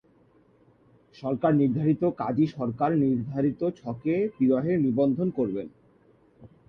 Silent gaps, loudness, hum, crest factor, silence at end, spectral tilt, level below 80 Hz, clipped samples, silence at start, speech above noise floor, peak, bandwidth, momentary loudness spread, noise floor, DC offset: none; -26 LUFS; none; 16 dB; 0.25 s; -10.5 dB/octave; -62 dBFS; under 0.1%; 1.2 s; 36 dB; -12 dBFS; 6 kHz; 8 LU; -61 dBFS; under 0.1%